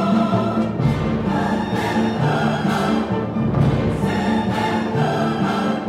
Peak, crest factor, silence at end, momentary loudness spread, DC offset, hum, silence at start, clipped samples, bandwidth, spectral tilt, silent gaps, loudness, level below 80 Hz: -6 dBFS; 12 dB; 0 s; 3 LU; under 0.1%; none; 0 s; under 0.1%; 13.5 kHz; -7 dB/octave; none; -20 LUFS; -40 dBFS